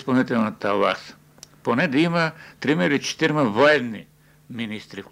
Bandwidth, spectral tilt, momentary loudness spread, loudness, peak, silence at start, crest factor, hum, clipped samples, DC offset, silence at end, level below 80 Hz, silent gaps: 15.5 kHz; -5.5 dB/octave; 15 LU; -21 LUFS; -4 dBFS; 0 s; 18 dB; none; under 0.1%; under 0.1%; 0.1 s; -64 dBFS; none